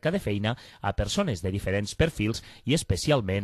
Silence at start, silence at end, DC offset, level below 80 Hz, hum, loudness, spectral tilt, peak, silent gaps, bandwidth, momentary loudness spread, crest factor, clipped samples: 0.05 s; 0 s; under 0.1%; -40 dBFS; none; -28 LUFS; -5.5 dB/octave; -10 dBFS; none; 13 kHz; 6 LU; 18 dB; under 0.1%